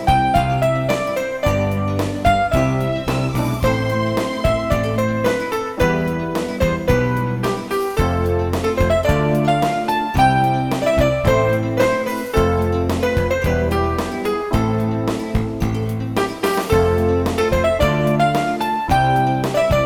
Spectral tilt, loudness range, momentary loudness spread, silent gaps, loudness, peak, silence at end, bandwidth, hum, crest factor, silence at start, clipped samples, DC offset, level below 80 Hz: -6.5 dB/octave; 3 LU; 5 LU; none; -18 LUFS; -2 dBFS; 0 s; 18.5 kHz; none; 16 dB; 0 s; under 0.1%; under 0.1%; -30 dBFS